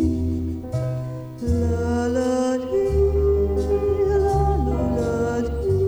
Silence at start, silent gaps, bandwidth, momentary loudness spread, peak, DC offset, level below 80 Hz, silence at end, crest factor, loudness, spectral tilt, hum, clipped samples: 0 s; none; 11 kHz; 8 LU; -8 dBFS; under 0.1%; -28 dBFS; 0 s; 12 dB; -22 LUFS; -8 dB/octave; none; under 0.1%